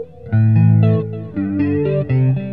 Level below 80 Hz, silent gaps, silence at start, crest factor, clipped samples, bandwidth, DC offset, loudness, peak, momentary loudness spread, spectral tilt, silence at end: -46 dBFS; none; 0 s; 12 dB; under 0.1%; 3.8 kHz; 0.6%; -16 LUFS; -4 dBFS; 9 LU; -12.5 dB/octave; 0 s